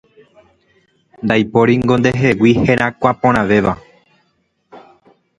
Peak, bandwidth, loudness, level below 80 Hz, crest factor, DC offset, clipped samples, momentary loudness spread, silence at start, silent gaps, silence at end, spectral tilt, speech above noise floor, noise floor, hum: 0 dBFS; 10.5 kHz; -14 LUFS; -42 dBFS; 16 dB; under 0.1%; under 0.1%; 5 LU; 1.2 s; none; 0.6 s; -7 dB/octave; 50 dB; -63 dBFS; none